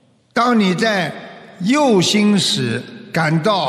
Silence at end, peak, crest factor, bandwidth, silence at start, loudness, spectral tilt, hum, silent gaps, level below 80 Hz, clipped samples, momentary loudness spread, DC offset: 0 s; -2 dBFS; 14 dB; 14 kHz; 0.35 s; -16 LUFS; -4.5 dB/octave; none; none; -62 dBFS; under 0.1%; 11 LU; under 0.1%